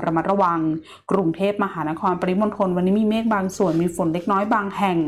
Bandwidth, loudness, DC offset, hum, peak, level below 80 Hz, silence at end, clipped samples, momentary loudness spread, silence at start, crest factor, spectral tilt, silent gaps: 13.5 kHz; -21 LUFS; under 0.1%; none; -8 dBFS; -56 dBFS; 0 s; under 0.1%; 5 LU; 0 s; 12 dB; -7 dB/octave; none